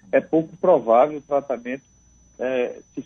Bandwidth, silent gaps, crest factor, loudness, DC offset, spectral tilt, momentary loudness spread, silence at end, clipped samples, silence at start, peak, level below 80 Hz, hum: 6.4 kHz; none; 16 dB; -21 LUFS; under 0.1%; -7 dB/octave; 13 LU; 0.05 s; under 0.1%; 0.15 s; -6 dBFS; -62 dBFS; none